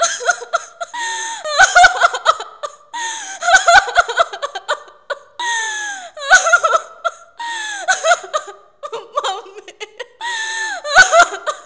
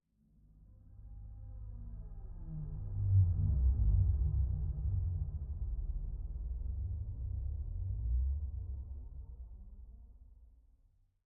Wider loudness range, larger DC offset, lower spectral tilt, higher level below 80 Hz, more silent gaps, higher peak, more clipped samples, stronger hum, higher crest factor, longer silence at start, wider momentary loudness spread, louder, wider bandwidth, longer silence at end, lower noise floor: about the same, 8 LU vs 9 LU; first, 0.2% vs under 0.1%; second, 1.5 dB/octave vs -15.5 dB/octave; second, -50 dBFS vs -38 dBFS; neither; first, 0 dBFS vs -20 dBFS; neither; neither; about the same, 16 dB vs 16 dB; second, 0 s vs 0.6 s; about the same, 20 LU vs 21 LU; first, -15 LUFS vs -37 LUFS; first, 8 kHz vs 1.3 kHz; second, 0.05 s vs 0.8 s; second, -34 dBFS vs -70 dBFS